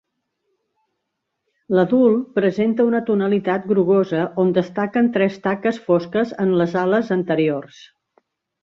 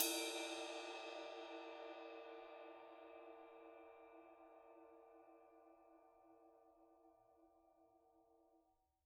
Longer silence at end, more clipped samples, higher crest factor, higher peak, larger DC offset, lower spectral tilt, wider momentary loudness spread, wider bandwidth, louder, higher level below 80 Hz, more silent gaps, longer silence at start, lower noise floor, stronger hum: first, 1 s vs 0.45 s; neither; second, 16 dB vs 30 dB; first, -4 dBFS vs -24 dBFS; neither; first, -8.5 dB/octave vs 0.5 dB/octave; second, 5 LU vs 22 LU; second, 7.2 kHz vs 13 kHz; first, -19 LUFS vs -51 LUFS; first, -64 dBFS vs under -90 dBFS; neither; first, 1.7 s vs 0 s; about the same, -77 dBFS vs -80 dBFS; neither